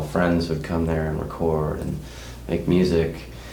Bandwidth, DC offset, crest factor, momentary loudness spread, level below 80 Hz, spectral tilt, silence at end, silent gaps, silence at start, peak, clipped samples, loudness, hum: 20 kHz; under 0.1%; 18 dB; 13 LU; -36 dBFS; -7.5 dB/octave; 0 s; none; 0 s; -6 dBFS; under 0.1%; -24 LUFS; none